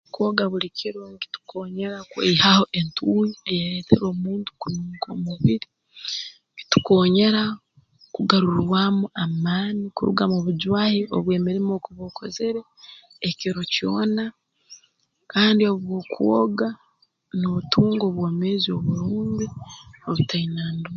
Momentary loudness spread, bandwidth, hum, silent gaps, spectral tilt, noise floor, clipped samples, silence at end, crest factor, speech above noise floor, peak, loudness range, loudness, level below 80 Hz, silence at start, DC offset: 15 LU; 7.4 kHz; none; none; -6 dB/octave; -65 dBFS; under 0.1%; 0 s; 22 dB; 43 dB; 0 dBFS; 4 LU; -22 LUFS; -54 dBFS; 0.15 s; under 0.1%